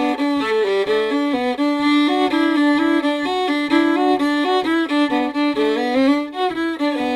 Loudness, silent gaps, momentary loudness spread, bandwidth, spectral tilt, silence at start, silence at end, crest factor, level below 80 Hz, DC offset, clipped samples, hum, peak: -18 LUFS; none; 4 LU; 11.5 kHz; -4 dB/octave; 0 s; 0 s; 14 dB; -56 dBFS; under 0.1%; under 0.1%; none; -2 dBFS